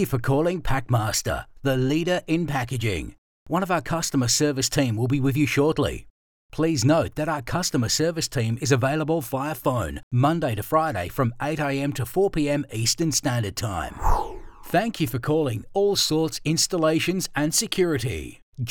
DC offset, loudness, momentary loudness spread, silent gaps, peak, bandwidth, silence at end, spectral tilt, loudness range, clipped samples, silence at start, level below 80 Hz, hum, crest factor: under 0.1%; -24 LUFS; 7 LU; 3.18-3.46 s, 6.10-6.49 s, 10.03-10.11 s, 18.42-18.52 s; -6 dBFS; over 20 kHz; 0 s; -4.5 dB/octave; 2 LU; under 0.1%; 0 s; -40 dBFS; none; 16 dB